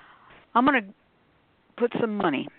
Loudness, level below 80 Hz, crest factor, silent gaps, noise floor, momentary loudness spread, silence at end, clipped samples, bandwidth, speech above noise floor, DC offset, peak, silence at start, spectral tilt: -25 LUFS; -66 dBFS; 22 dB; none; -64 dBFS; 8 LU; 0.1 s; under 0.1%; 4.4 kHz; 39 dB; under 0.1%; -6 dBFS; 0.55 s; -3.5 dB/octave